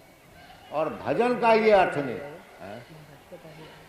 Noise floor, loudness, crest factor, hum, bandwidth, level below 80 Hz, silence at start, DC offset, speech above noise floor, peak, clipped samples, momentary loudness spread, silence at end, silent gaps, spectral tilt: -51 dBFS; -24 LUFS; 18 dB; none; 14.5 kHz; -60 dBFS; 0.7 s; under 0.1%; 28 dB; -8 dBFS; under 0.1%; 25 LU; 0.15 s; none; -6 dB/octave